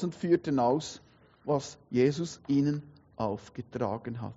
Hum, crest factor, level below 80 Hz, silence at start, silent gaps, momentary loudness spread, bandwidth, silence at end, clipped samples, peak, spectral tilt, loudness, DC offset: none; 18 dB; -66 dBFS; 0 s; none; 14 LU; 8 kHz; 0.05 s; under 0.1%; -14 dBFS; -7 dB/octave; -30 LUFS; under 0.1%